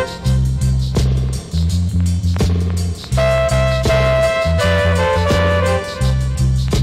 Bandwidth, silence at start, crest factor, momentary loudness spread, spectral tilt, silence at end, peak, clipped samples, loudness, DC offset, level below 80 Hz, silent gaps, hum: 14.5 kHz; 0 s; 8 dB; 4 LU; -6 dB/octave; 0 s; -8 dBFS; under 0.1%; -16 LUFS; under 0.1%; -22 dBFS; none; none